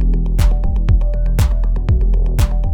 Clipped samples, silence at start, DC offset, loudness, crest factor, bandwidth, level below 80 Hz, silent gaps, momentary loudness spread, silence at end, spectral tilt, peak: under 0.1%; 0 s; under 0.1%; -17 LUFS; 10 dB; 14.5 kHz; -14 dBFS; none; 2 LU; 0 s; -7 dB/octave; -4 dBFS